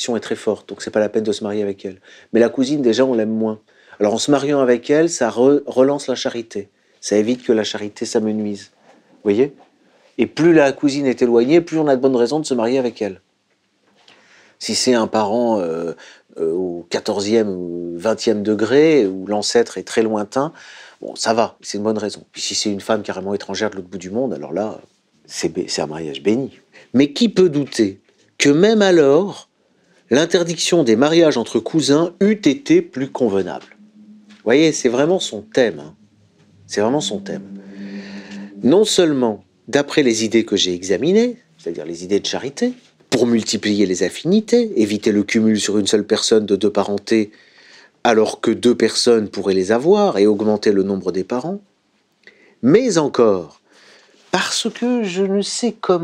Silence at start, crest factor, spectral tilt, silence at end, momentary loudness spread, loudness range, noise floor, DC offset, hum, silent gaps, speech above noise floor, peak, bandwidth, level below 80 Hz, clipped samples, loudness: 0 s; 18 dB; -4.5 dB/octave; 0 s; 13 LU; 6 LU; -64 dBFS; under 0.1%; none; none; 47 dB; 0 dBFS; 13.5 kHz; -64 dBFS; under 0.1%; -17 LUFS